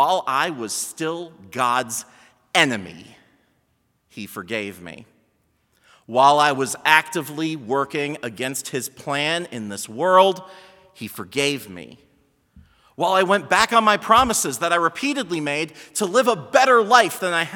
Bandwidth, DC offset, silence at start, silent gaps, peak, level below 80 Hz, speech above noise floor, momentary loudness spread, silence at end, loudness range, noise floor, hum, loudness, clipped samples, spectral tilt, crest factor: 18 kHz; under 0.1%; 0 s; none; 0 dBFS; -58 dBFS; 47 dB; 17 LU; 0 s; 7 LU; -67 dBFS; none; -20 LUFS; under 0.1%; -3 dB/octave; 22 dB